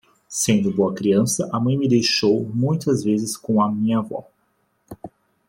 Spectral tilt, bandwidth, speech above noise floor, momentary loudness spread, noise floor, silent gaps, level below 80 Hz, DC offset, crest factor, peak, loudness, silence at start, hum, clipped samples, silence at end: -5 dB/octave; 16.5 kHz; 47 dB; 13 LU; -67 dBFS; none; -60 dBFS; under 0.1%; 16 dB; -4 dBFS; -20 LUFS; 0.3 s; none; under 0.1%; 0.4 s